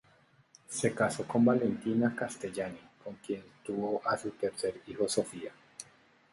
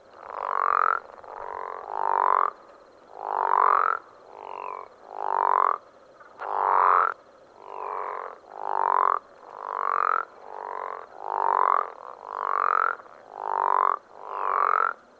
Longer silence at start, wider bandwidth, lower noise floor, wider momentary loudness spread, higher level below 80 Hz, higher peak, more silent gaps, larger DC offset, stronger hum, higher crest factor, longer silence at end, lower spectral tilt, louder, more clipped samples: first, 0.7 s vs 0.15 s; first, 11.5 kHz vs 7.6 kHz; first, -65 dBFS vs -51 dBFS; about the same, 19 LU vs 17 LU; first, -70 dBFS vs -76 dBFS; second, -14 dBFS vs -6 dBFS; neither; neither; neither; about the same, 20 dB vs 20 dB; first, 0.5 s vs 0.25 s; about the same, -5 dB/octave vs -4 dB/octave; second, -33 LUFS vs -25 LUFS; neither